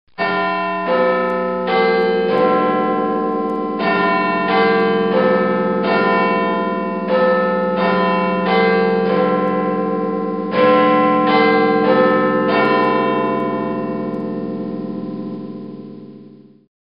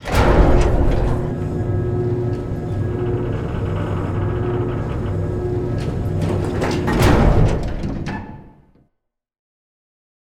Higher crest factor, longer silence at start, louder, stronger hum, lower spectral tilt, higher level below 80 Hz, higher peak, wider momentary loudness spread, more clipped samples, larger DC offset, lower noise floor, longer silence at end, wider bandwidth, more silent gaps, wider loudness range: about the same, 14 dB vs 16 dB; first, 0.2 s vs 0 s; first, -16 LUFS vs -20 LUFS; neither; first, -9 dB/octave vs -7.5 dB/octave; second, -60 dBFS vs -24 dBFS; about the same, -2 dBFS vs -2 dBFS; about the same, 11 LU vs 10 LU; neither; first, 0.3% vs under 0.1%; second, -42 dBFS vs -74 dBFS; second, 0.55 s vs 1.45 s; second, 5.4 kHz vs 15 kHz; neither; about the same, 5 LU vs 3 LU